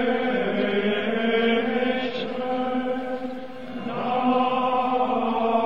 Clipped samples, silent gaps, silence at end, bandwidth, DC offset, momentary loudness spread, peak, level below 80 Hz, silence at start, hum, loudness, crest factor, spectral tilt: under 0.1%; none; 0 s; 7 kHz; 1%; 10 LU; -10 dBFS; -64 dBFS; 0 s; none; -24 LUFS; 14 dB; -7 dB/octave